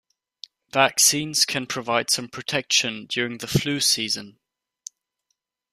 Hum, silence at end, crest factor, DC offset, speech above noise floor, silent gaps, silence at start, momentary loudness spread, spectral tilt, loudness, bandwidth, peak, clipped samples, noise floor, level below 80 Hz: none; 1.4 s; 22 dB; under 0.1%; 54 dB; none; 0.75 s; 11 LU; -2 dB/octave; -21 LUFS; 15.5 kHz; -2 dBFS; under 0.1%; -77 dBFS; -60 dBFS